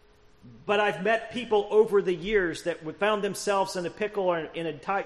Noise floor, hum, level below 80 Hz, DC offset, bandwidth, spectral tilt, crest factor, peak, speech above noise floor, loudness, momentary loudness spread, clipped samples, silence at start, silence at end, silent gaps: -54 dBFS; none; -56 dBFS; under 0.1%; 13 kHz; -4.5 dB/octave; 16 dB; -10 dBFS; 28 dB; -27 LUFS; 9 LU; under 0.1%; 0.45 s; 0 s; none